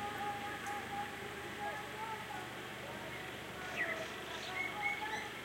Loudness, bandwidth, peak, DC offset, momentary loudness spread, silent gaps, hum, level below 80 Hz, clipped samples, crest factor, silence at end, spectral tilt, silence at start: -41 LUFS; 16.5 kHz; -26 dBFS; under 0.1%; 7 LU; none; none; -68 dBFS; under 0.1%; 18 dB; 0 s; -3 dB/octave; 0 s